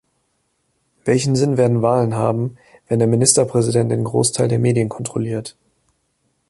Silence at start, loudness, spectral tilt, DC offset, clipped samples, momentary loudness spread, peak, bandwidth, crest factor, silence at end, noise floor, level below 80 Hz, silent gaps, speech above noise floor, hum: 1.05 s; -18 LUFS; -5.5 dB/octave; under 0.1%; under 0.1%; 11 LU; 0 dBFS; 11.5 kHz; 18 dB; 1 s; -67 dBFS; -52 dBFS; none; 50 dB; none